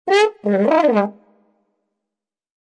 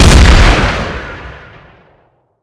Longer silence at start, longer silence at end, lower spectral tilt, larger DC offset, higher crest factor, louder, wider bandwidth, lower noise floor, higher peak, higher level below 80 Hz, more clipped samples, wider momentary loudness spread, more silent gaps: about the same, 0.05 s vs 0 s; first, 1.5 s vs 1.1 s; about the same, -5.5 dB/octave vs -4.5 dB/octave; neither; first, 16 dB vs 10 dB; second, -17 LUFS vs -9 LUFS; about the same, 10.5 kHz vs 11 kHz; first, -86 dBFS vs -52 dBFS; about the same, -2 dBFS vs 0 dBFS; second, -74 dBFS vs -12 dBFS; second, under 0.1% vs 4%; second, 5 LU vs 23 LU; neither